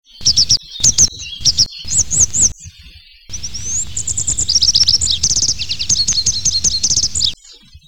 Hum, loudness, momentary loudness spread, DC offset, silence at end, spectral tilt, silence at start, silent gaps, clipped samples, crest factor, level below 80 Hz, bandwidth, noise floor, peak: none; -12 LUFS; 9 LU; 5%; 0 s; 0.5 dB/octave; 0 s; none; under 0.1%; 14 dB; -34 dBFS; 19 kHz; -42 dBFS; -2 dBFS